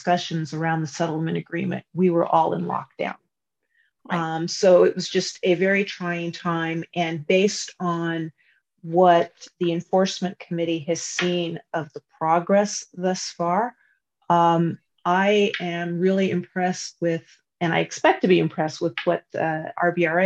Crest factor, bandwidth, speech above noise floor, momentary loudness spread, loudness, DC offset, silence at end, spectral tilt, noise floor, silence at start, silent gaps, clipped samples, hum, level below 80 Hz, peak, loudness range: 18 dB; 8.8 kHz; 56 dB; 10 LU; -23 LUFS; under 0.1%; 0 s; -5 dB/octave; -78 dBFS; 0 s; none; under 0.1%; none; -70 dBFS; -4 dBFS; 3 LU